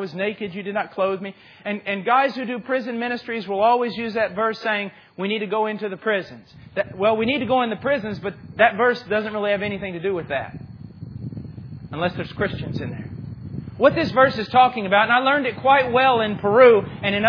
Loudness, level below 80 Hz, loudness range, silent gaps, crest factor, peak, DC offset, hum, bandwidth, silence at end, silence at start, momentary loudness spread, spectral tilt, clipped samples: -21 LUFS; -54 dBFS; 9 LU; none; 20 dB; 0 dBFS; under 0.1%; none; 5.4 kHz; 0 s; 0 s; 17 LU; -7.5 dB/octave; under 0.1%